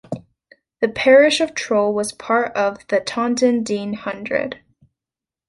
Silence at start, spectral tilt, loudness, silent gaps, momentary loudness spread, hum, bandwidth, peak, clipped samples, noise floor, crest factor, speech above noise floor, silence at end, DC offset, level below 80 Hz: 0.1 s; -4 dB/octave; -18 LUFS; none; 15 LU; none; 11.5 kHz; -2 dBFS; under 0.1%; -89 dBFS; 18 dB; 71 dB; 0.95 s; under 0.1%; -58 dBFS